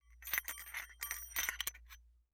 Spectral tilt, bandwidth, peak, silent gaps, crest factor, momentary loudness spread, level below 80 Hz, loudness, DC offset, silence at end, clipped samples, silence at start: 1 dB/octave; over 20 kHz; -16 dBFS; none; 28 dB; 20 LU; -62 dBFS; -40 LUFS; under 0.1%; 0.2 s; under 0.1%; 0.05 s